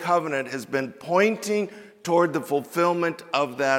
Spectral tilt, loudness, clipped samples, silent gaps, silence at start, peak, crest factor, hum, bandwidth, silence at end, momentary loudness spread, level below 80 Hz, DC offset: -5 dB/octave; -24 LUFS; under 0.1%; none; 0 s; -6 dBFS; 18 dB; none; 17 kHz; 0 s; 7 LU; -76 dBFS; under 0.1%